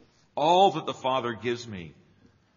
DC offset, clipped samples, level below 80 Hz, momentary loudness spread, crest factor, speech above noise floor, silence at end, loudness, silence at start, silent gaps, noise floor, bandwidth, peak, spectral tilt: under 0.1%; under 0.1%; -68 dBFS; 19 LU; 20 dB; 35 dB; 0.65 s; -25 LUFS; 0.35 s; none; -61 dBFS; 7.2 kHz; -8 dBFS; -3 dB/octave